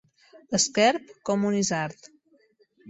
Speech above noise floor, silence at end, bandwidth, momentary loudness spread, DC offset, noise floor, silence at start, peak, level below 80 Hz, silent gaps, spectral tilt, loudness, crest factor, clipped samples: 38 dB; 0 s; 8.4 kHz; 10 LU; under 0.1%; -63 dBFS; 0.5 s; -8 dBFS; -66 dBFS; none; -3.5 dB/octave; -25 LUFS; 20 dB; under 0.1%